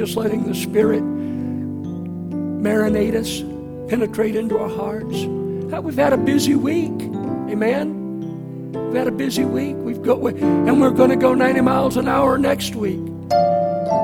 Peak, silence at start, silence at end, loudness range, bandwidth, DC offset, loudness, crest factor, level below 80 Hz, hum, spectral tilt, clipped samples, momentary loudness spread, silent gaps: 0 dBFS; 0 s; 0 s; 5 LU; 17.5 kHz; under 0.1%; -19 LUFS; 18 dB; -48 dBFS; none; -6 dB/octave; under 0.1%; 12 LU; none